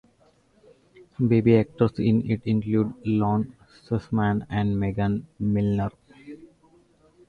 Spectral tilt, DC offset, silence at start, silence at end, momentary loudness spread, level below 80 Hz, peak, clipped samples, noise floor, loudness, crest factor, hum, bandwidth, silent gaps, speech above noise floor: -10 dB/octave; under 0.1%; 1.2 s; 0.85 s; 12 LU; -50 dBFS; -6 dBFS; under 0.1%; -61 dBFS; -24 LUFS; 18 dB; none; 4.9 kHz; none; 38 dB